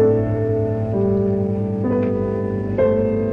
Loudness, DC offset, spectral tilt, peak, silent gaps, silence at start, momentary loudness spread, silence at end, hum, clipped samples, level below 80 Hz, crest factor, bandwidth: -20 LUFS; under 0.1%; -11.5 dB/octave; -6 dBFS; none; 0 s; 4 LU; 0 s; none; under 0.1%; -40 dBFS; 12 dB; 3.9 kHz